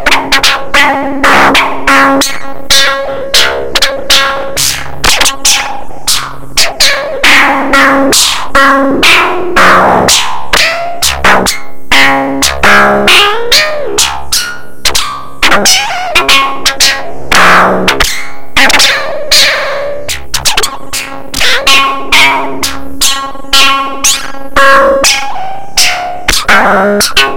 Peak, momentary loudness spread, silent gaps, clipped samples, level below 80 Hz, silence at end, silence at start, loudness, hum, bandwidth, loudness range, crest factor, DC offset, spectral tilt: 0 dBFS; 9 LU; none; 4%; -26 dBFS; 0 s; 0 s; -6 LUFS; none; over 20 kHz; 3 LU; 8 dB; under 0.1%; -1 dB/octave